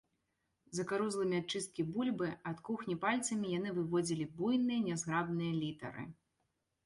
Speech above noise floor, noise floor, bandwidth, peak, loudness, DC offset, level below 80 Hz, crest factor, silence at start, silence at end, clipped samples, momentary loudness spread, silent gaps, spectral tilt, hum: 47 dB; -83 dBFS; 11.5 kHz; -20 dBFS; -37 LUFS; under 0.1%; -72 dBFS; 18 dB; 0.7 s; 0.75 s; under 0.1%; 9 LU; none; -5 dB/octave; none